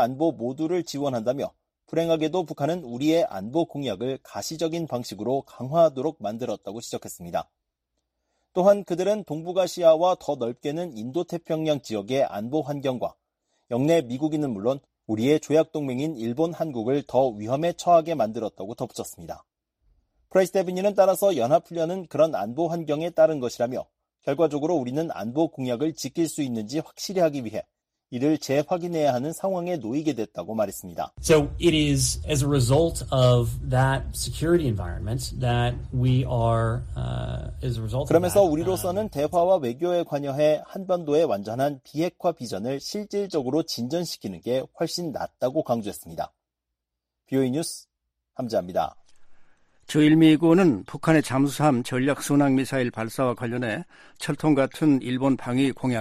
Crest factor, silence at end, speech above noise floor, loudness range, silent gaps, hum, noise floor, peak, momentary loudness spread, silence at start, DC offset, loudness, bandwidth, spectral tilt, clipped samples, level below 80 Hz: 18 dB; 0 s; 60 dB; 6 LU; none; none; -84 dBFS; -6 dBFS; 11 LU; 0 s; under 0.1%; -25 LUFS; 15.5 kHz; -6 dB/octave; under 0.1%; -46 dBFS